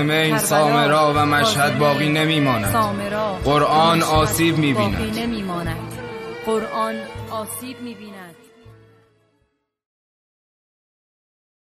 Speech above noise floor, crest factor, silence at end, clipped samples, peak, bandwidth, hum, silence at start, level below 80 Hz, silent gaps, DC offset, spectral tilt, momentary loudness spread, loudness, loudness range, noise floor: 50 dB; 16 dB; 3 s; under 0.1%; -4 dBFS; 13.5 kHz; none; 0 s; -42 dBFS; none; under 0.1%; -4.5 dB/octave; 16 LU; -18 LUFS; 15 LU; -68 dBFS